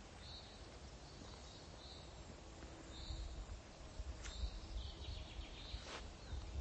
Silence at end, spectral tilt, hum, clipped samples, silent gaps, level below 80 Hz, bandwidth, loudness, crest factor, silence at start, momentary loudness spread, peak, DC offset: 0 s; -4 dB/octave; none; under 0.1%; none; -52 dBFS; 8.4 kHz; -53 LUFS; 18 dB; 0 s; 7 LU; -32 dBFS; under 0.1%